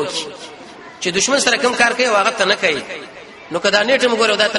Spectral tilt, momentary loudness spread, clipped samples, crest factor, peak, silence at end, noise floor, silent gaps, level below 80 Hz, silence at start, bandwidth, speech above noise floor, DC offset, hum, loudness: -1.5 dB/octave; 21 LU; under 0.1%; 18 dB; 0 dBFS; 0 s; -37 dBFS; none; -58 dBFS; 0 s; 11.5 kHz; 20 dB; under 0.1%; none; -15 LUFS